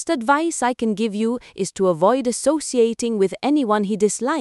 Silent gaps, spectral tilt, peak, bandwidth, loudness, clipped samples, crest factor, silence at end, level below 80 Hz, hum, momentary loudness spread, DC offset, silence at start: none; -4.5 dB/octave; -4 dBFS; 12 kHz; -20 LUFS; under 0.1%; 16 dB; 0 s; -60 dBFS; none; 4 LU; under 0.1%; 0 s